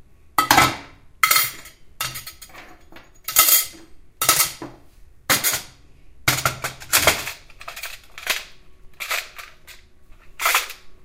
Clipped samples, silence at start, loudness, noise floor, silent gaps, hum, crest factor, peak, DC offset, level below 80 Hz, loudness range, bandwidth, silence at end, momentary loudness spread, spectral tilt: under 0.1%; 0.4 s; -19 LUFS; -46 dBFS; none; none; 24 dB; 0 dBFS; under 0.1%; -48 dBFS; 7 LU; 16.5 kHz; 0 s; 22 LU; -0.5 dB/octave